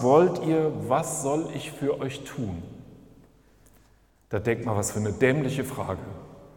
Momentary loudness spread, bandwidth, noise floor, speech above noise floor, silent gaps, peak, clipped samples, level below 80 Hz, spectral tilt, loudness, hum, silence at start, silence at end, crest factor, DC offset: 13 LU; 18 kHz; -60 dBFS; 34 dB; none; -6 dBFS; under 0.1%; -56 dBFS; -6 dB/octave; -27 LUFS; none; 0 s; 0.1 s; 22 dB; under 0.1%